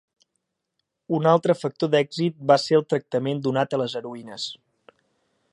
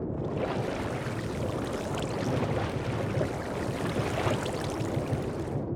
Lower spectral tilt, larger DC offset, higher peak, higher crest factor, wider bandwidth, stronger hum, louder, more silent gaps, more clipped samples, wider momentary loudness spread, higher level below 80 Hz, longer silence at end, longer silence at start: about the same, -6 dB/octave vs -6.5 dB/octave; neither; first, -2 dBFS vs -16 dBFS; first, 22 dB vs 16 dB; second, 11 kHz vs 17 kHz; neither; first, -23 LUFS vs -31 LUFS; neither; neither; first, 13 LU vs 4 LU; second, -74 dBFS vs -48 dBFS; first, 1 s vs 0 s; first, 1.1 s vs 0 s